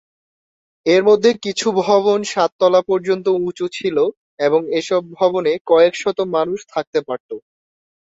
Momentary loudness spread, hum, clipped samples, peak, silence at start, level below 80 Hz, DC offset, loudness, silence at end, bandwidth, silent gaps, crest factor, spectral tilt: 9 LU; none; under 0.1%; -2 dBFS; 0.85 s; -64 dBFS; under 0.1%; -17 LUFS; 0.65 s; 8 kHz; 2.52-2.59 s, 4.17-4.38 s, 5.61-5.65 s, 6.87-6.93 s, 7.20-7.29 s; 16 dB; -4.5 dB/octave